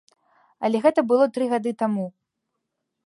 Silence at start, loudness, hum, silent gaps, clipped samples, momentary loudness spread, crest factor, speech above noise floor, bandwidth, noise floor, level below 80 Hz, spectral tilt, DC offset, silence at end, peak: 0.6 s; -22 LUFS; none; none; under 0.1%; 9 LU; 18 dB; 59 dB; 11.5 kHz; -80 dBFS; -74 dBFS; -7 dB/octave; under 0.1%; 0.95 s; -6 dBFS